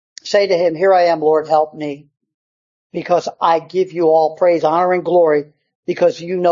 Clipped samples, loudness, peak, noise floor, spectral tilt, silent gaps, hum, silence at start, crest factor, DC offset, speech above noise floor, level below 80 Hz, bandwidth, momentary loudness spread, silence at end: under 0.1%; -15 LUFS; -2 dBFS; under -90 dBFS; -5.5 dB/octave; 2.34-2.90 s, 5.75-5.83 s; none; 0.25 s; 14 dB; under 0.1%; over 75 dB; -68 dBFS; 7.6 kHz; 13 LU; 0 s